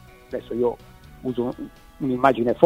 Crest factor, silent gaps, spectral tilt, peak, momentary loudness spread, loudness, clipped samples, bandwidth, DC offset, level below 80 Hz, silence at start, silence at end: 24 dB; none; -7.5 dB/octave; 0 dBFS; 17 LU; -25 LUFS; under 0.1%; 16 kHz; under 0.1%; -50 dBFS; 0.3 s; 0 s